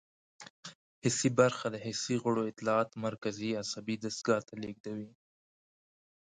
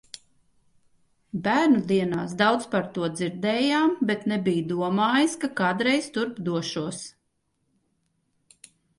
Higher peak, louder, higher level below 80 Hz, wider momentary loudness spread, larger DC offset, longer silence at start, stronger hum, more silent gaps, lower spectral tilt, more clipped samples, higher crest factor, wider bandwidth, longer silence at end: second, -12 dBFS vs -8 dBFS; second, -33 LUFS vs -24 LUFS; second, -72 dBFS vs -66 dBFS; first, 20 LU vs 10 LU; neither; second, 0.4 s vs 1.35 s; neither; first, 0.50-0.63 s, 0.75-1.02 s, 4.80-4.84 s vs none; about the same, -4.5 dB/octave vs -5 dB/octave; neither; first, 24 dB vs 18 dB; second, 9.6 kHz vs 11.5 kHz; second, 1.2 s vs 1.9 s